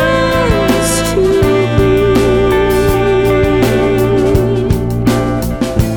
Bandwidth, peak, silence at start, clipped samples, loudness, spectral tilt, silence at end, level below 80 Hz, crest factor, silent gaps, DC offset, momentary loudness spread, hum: over 20 kHz; 0 dBFS; 0 s; under 0.1%; -12 LUFS; -6 dB/octave; 0 s; -22 dBFS; 10 dB; none; under 0.1%; 4 LU; none